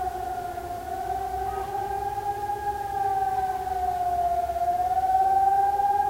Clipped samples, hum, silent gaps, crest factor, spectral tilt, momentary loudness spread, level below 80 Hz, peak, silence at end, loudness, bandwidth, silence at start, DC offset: under 0.1%; none; none; 14 dB; -5 dB/octave; 10 LU; -46 dBFS; -12 dBFS; 0 s; -26 LUFS; 16 kHz; 0 s; under 0.1%